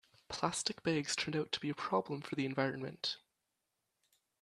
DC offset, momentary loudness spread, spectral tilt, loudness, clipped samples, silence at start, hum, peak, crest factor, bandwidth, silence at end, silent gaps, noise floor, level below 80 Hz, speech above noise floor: under 0.1%; 5 LU; -4 dB/octave; -37 LUFS; under 0.1%; 0.3 s; none; -16 dBFS; 22 dB; 13 kHz; 1.25 s; none; -86 dBFS; -74 dBFS; 49 dB